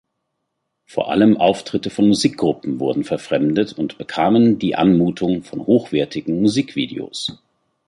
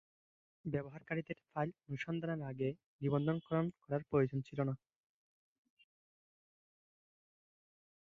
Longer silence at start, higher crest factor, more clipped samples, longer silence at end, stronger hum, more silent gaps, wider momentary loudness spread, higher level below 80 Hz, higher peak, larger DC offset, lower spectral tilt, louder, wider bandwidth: first, 0.95 s vs 0.65 s; about the same, 16 dB vs 20 dB; neither; second, 0.55 s vs 3.25 s; neither; second, none vs 2.86-2.99 s; first, 11 LU vs 7 LU; first, -54 dBFS vs -72 dBFS; first, -2 dBFS vs -20 dBFS; neither; second, -6 dB/octave vs -7.5 dB/octave; first, -18 LUFS vs -40 LUFS; first, 11.5 kHz vs 7 kHz